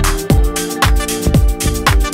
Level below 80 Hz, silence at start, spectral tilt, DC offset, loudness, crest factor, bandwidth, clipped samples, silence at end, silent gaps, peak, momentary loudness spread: -16 dBFS; 0 s; -4.5 dB/octave; under 0.1%; -15 LUFS; 12 dB; 16.5 kHz; under 0.1%; 0 s; none; 0 dBFS; 2 LU